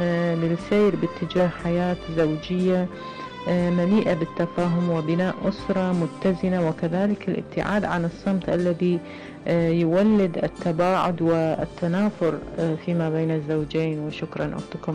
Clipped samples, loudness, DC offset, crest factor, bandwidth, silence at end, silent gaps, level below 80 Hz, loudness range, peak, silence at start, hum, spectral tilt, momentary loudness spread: under 0.1%; -24 LUFS; under 0.1%; 10 dB; 9.8 kHz; 0 s; none; -50 dBFS; 2 LU; -12 dBFS; 0 s; none; -8 dB/octave; 7 LU